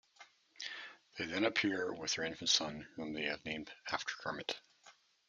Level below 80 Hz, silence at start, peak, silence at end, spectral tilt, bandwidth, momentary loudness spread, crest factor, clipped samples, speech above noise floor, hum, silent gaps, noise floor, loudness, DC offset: -74 dBFS; 0.2 s; -16 dBFS; 0.4 s; -2 dB/octave; 11 kHz; 14 LU; 24 dB; under 0.1%; 27 dB; none; none; -65 dBFS; -38 LUFS; under 0.1%